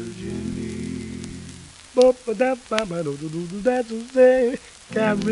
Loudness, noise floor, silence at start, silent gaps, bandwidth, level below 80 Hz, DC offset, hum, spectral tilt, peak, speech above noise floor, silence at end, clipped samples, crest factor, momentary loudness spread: -22 LUFS; -42 dBFS; 0 s; none; 11.5 kHz; -50 dBFS; under 0.1%; none; -5.5 dB/octave; 0 dBFS; 21 dB; 0 s; under 0.1%; 22 dB; 18 LU